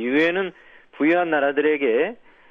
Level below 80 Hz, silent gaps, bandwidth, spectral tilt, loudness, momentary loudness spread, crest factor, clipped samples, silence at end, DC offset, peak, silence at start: -68 dBFS; none; 6.6 kHz; -6.5 dB/octave; -21 LUFS; 7 LU; 14 dB; under 0.1%; 0.35 s; under 0.1%; -8 dBFS; 0 s